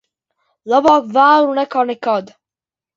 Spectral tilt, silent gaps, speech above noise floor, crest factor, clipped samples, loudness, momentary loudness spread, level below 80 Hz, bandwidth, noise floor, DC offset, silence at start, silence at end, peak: -5 dB/octave; none; over 76 dB; 16 dB; under 0.1%; -14 LUFS; 8 LU; -62 dBFS; 7.6 kHz; under -90 dBFS; under 0.1%; 0.65 s; 0.7 s; 0 dBFS